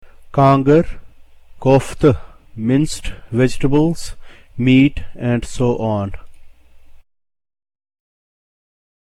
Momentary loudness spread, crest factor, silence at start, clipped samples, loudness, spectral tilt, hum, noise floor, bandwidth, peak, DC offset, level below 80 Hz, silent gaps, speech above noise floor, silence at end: 14 LU; 16 dB; 0.05 s; under 0.1%; -16 LUFS; -7 dB/octave; none; -40 dBFS; 12.5 kHz; -2 dBFS; under 0.1%; -34 dBFS; none; 25 dB; 2.1 s